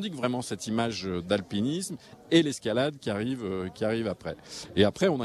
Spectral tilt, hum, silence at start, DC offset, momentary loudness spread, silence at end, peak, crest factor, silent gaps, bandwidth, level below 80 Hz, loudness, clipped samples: -5 dB/octave; none; 0 s; under 0.1%; 10 LU; 0 s; -8 dBFS; 20 dB; none; 13.5 kHz; -62 dBFS; -29 LUFS; under 0.1%